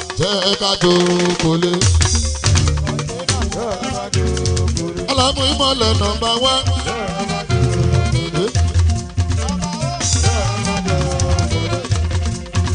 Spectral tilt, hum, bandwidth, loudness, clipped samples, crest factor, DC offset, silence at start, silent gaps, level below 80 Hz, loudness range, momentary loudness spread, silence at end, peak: -4.5 dB/octave; none; 10 kHz; -17 LUFS; under 0.1%; 16 dB; under 0.1%; 0 s; none; -28 dBFS; 3 LU; 7 LU; 0 s; 0 dBFS